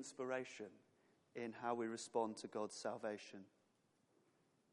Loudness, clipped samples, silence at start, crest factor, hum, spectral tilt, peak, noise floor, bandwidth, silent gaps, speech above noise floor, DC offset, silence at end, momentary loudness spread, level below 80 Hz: -46 LUFS; under 0.1%; 0 s; 22 dB; none; -4 dB/octave; -26 dBFS; -80 dBFS; 11.5 kHz; none; 34 dB; under 0.1%; 1.25 s; 14 LU; under -90 dBFS